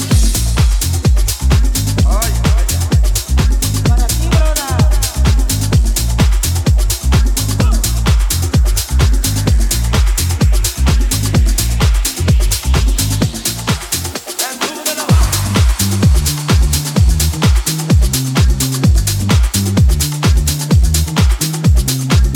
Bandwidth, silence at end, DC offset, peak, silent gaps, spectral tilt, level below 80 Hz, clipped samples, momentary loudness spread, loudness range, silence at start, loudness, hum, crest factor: 19 kHz; 0 s; under 0.1%; 0 dBFS; none; -4.5 dB/octave; -14 dBFS; under 0.1%; 2 LU; 2 LU; 0 s; -14 LUFS; none; 12 dB